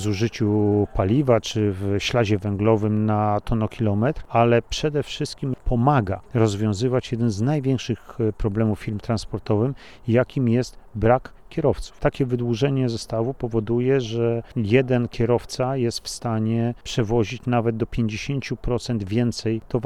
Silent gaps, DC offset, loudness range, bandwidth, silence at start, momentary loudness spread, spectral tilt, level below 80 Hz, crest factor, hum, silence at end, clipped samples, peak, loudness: none; 0.4%; 3 LU; 12 kHz; 0 s; 7 LU; -7 dB/octave; -40 dBFS; 18 dB; none; 0 s; under 0.1%; -4 dBFS; -23 LUFS